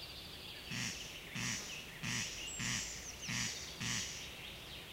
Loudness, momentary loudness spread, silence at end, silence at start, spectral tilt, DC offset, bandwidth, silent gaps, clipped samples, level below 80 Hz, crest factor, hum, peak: -41 LUFS; 9 LU; 0 s; 0 s; -1.5 dB/octave; under 0.1%; 16 kHz; none; under 0.1%; -60 dBFS; 18 dB; none; -26 dBFS